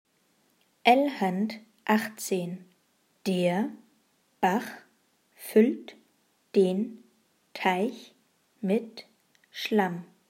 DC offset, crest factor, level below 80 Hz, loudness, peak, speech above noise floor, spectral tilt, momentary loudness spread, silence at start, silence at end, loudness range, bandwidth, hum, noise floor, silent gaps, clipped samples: under 0.1%; 24 dB; -80 dBFS; -28 LUFS; -6 dBFS; 43 dB; -5.5 dB/octave; 21 LU; 0.85 s; 0.25 s; 3 LU; 16 kHz; none; -69 dBFS; none; under 0.1%